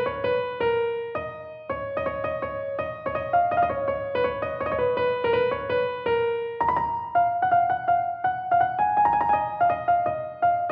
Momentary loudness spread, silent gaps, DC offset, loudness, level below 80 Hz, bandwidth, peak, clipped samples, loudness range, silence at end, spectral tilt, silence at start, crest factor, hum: 8 LU; none; under 0.1%; -25 LUFS; -52 dBFS; 5.2 kHz; -10 dBFS; under 0.1%; 4 LU; 0 s; -8 dB/octave; 0 s; 14 dB; none